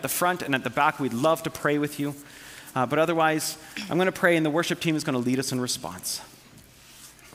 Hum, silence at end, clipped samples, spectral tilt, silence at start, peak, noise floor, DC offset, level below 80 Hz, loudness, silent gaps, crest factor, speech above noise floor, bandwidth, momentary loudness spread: none; 0.05 s; under 0.1%; -4 dB/octave; 0 s; -6 dBFS; -51 dBFS; under 0.1%; -64 dBFS; -25 LUFS; none; 20 dB; 26 dB; 16.5 kHz; 12 LU